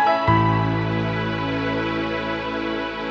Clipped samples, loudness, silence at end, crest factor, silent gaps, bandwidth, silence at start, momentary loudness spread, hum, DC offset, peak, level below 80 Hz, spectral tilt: under 0.1%; -22 LUFS; 0 s; 16 dB; none; 6.8 kHz; 0 s; 7 LU; none; under 0.1%; -6 dBFS; -42 dBFS; -7.5 dB/octave